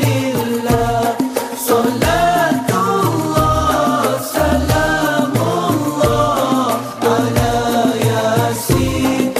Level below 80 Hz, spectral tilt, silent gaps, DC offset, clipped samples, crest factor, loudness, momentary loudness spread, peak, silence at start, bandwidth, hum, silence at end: -32 dBFS; -5.5 dB/octave; none; under 0.1%; under 0.1%; 14 dB; -15 LUFS; 3 LU; 0 dBFS; 0 s; 15.5 kHz; none; 0 s